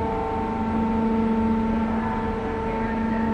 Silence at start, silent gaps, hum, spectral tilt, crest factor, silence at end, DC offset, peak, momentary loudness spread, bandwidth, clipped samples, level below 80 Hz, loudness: 0 s; none; none; -8.5 dB/octave; 12 dB; 0 s; under 0.1%; -12 dBFS; 4 LU; 6.4 kHz; under 0.1%; -38 dBFS; -24 LUFS